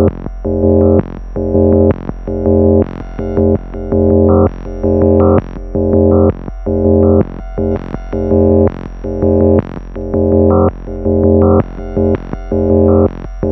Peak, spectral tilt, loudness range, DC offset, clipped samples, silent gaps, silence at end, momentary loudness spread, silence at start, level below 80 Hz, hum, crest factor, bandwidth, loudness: 0 dBFS; -12 dB/octave; 2 LU; under 0.1%; under 0.1%; none; 0 s; 11 LU; 0 s; -28 dBFS; none; 12 dB; 3.2 kHz; -12 LUFS